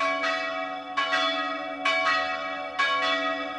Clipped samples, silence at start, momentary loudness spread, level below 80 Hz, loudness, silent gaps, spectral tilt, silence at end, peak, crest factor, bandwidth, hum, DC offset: under 0.1%; 0 s; 7 LU; -66 dBFS; -26 LUFS; none; -1.5 dB/octave; 0 s; -12 dBFS; 16 dB; 11 kHz; none; under 0.1%